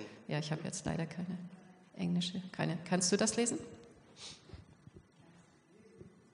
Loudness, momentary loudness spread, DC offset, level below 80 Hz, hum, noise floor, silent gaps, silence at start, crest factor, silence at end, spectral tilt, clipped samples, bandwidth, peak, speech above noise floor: -36 LUFS; 26 LU; under 0.1%; -66 dBFS; none; -63 dBFS; none; 0 s; 22 dB; 0.25 s; -4 dB/octave; under 0.1%; 10.5 kHz; -16 dBFS; 27 dB